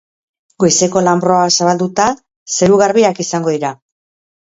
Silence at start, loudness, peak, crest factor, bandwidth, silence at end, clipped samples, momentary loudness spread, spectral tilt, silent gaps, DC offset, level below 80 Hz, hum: 0.6 s; -13 LUFS; 0 dBFS; 14 dB; 8 kHz; 0.7 s; under 0.1%; 9 LU; -4 dB/octave; 2.36-2.46 s; under 0.1%; -52 dBFS; none